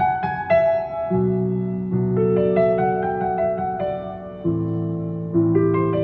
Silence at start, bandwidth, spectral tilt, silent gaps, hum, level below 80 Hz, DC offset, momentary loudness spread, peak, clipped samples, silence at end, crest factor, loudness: 0 s; 4.4 kHz; -11.5 dB/octave; none; none; -50 dBFS; under 0.1%; 8 LU; -4 dBFS; under 0.1%; 0 s; 16 dB; -21 LUFS